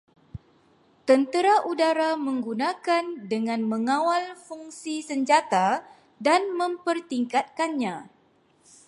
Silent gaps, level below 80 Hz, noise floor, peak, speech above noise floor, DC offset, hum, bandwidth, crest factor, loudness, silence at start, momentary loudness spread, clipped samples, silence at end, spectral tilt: none; -64 dBFS; -62 dBFS; -6 dBFS; 38 dB; under 0.1%; none; 11.5 kHz; 20 dB; -25 LUFS; 0.35 s; 16 LU; under 0.1%; 0.8 s; -4 dB/octave